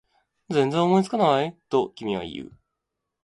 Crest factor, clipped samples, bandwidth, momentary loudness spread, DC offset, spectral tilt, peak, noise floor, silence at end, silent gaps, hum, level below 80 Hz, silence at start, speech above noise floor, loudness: 20 dB; under 0.1%; 11.5 kHz; 15 LU; under 0.1%; -6.5 dB/octave; -6 dBFS; -82 dBFS; 0.8 s; none; none; -62 dBFS; 0.5 s; 59 dB; -23 LUFS